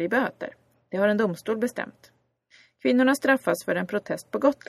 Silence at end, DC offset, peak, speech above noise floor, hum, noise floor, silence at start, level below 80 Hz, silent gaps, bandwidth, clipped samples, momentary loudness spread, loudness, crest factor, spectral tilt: 0.15 s; under 0.1%; -6 dBFS; 35 dB; none; -59 dBFS; 0 s; -70 dBFS; none; 14.5 kHz; under 0.1%; 14 LU; -25 LUFS; 20 dB; -5.5 dB/octave